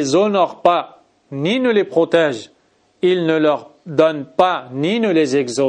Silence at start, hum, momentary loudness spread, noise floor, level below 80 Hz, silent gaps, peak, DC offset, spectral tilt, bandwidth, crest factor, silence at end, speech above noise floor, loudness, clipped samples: 0 s; none; 7 LU; -57 dBFS; -66 dBFS; none; 0 dBFS; under 0.1%; -5.5 dB/octave; 10 kHz; 16 dB; 0 s; 41 dB; -17 LUFS; under 0.1%